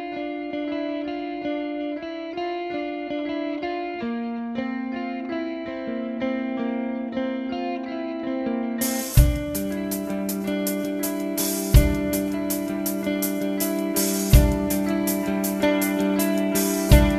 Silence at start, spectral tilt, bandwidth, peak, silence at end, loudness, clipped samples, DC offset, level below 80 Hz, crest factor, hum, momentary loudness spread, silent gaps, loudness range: 0 s; -5.5 dB/octave; 14 kHz; 0 dBFS; 0 s; -25 LUFS; under 0.1%; under 0.1%; -30 dBFS; 22 dB; none; 10 LU; none; 7 LU